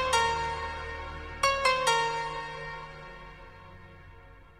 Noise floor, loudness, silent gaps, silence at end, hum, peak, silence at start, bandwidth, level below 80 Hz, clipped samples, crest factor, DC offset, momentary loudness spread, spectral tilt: -51 dBFS; -29 LUFS; none; 0 s; none; -12 dBFS; 0 s; 15 kHz; -48 dBFS; under 0.1%; 20 dB; under 0.1%; 24 LU; -2 dB/octave